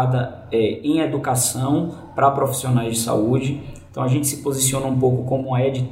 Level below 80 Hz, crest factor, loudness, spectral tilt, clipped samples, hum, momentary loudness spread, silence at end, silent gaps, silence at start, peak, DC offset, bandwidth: -50 dBFS; 16 dB; -20 LUFS; -5.5 dB/octave; under 0.1%; none; 5 LU; 0 s; none; 0 s; -4 dBFS; under 0.1%; 16 kHz